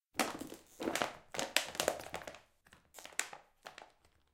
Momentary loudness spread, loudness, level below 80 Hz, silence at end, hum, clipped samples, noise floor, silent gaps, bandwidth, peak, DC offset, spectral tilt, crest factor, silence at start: 20 LU; -39 LUFS; -70 dBFS; 0.45 s; none; under 0.1%; -67 dBFS; none; 16.5 kHz; -6 dBFS; under 0.1%; -1.5 dB/octave; 36 dB; 0.15 s